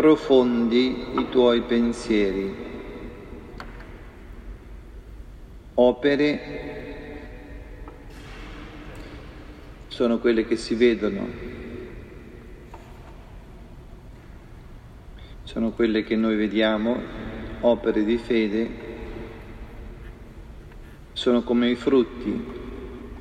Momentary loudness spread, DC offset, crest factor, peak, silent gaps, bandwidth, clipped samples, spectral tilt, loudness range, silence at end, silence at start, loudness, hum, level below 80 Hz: 24 LU; under 0.1%; 20 dB; -4 dBFS; none; 10 kHz; under 0.1%; -6.5 dB/octave; 16 LU; 0 s; 0 s; -23 LUFS; none; -44 dBFS